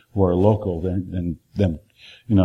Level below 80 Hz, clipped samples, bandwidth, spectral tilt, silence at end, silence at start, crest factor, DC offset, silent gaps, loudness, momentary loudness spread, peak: -42 dBFS; under 0.1%; 6.2 kHz; -10 dB/octave; 0 s; 0.15 s; 18 dB; under 0.1%; none; -22 LUFS; 11 LU; -2 dBFS